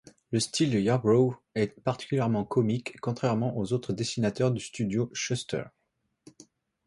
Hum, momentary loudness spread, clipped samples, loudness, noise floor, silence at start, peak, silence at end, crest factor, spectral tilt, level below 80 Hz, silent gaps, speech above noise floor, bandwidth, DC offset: none; 8 LU; under 0.1%; -28 LUFS; -78 dBFS; 0.3 s; -12 dBFS; 1.2 s; 18 dB; -6 dB/octave; -62 dBFS; none; 50 dB; 11.5 kHz; under 0.1%